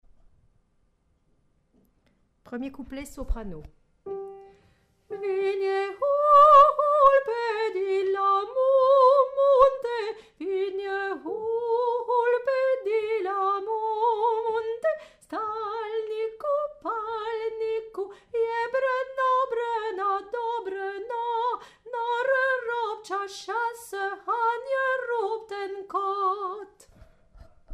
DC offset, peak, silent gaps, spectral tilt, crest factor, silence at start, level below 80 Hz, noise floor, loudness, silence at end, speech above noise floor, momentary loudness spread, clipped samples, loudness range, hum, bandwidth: under 0.1%; -6 dBFS; none; -4.5 dB/octave; 20 dB; 2.5 s; -50 dBFS; -68 dBFS; -25 LUFS; 0 s; 34 dB; 17 LU; under 0.1%; 15 LU; none; 13 kHz